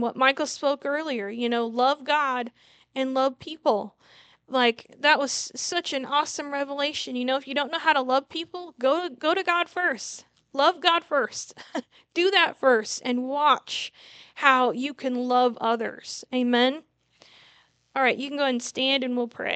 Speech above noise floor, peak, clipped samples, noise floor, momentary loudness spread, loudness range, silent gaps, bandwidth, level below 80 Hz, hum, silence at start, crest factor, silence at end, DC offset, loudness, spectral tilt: 35 dB; -2 dBFS; under 0.1%; -60 dBFS; 12 LU; 3 LU; none; 9.2 kHz; -78 dBFS; none; 0 s; 24 dB; 0 s; under 0.1%; -25 LUFS; -2 dB/octave